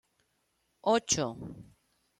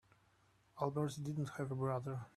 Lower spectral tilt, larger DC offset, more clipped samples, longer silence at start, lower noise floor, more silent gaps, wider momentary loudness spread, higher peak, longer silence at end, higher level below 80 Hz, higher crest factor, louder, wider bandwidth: second, -3 dB/octave vs -7.5 dB/octave; neither; neither; about the same, 0.85 s vs 0.75 s; about the same, -76 dBFS vs -73 dBFS; neither; first, 18 LU vs 3 LU; first, -14 dBFS vs -22 dBFS; first, 0.55 s vs 0.05 s; first, -64 dBFS vs -74 dBFS; about the same, 20 dB vs 20 dB; first, -30 LUFS vs -41 LUFS; about the same, 14 kHz vs 13 kHz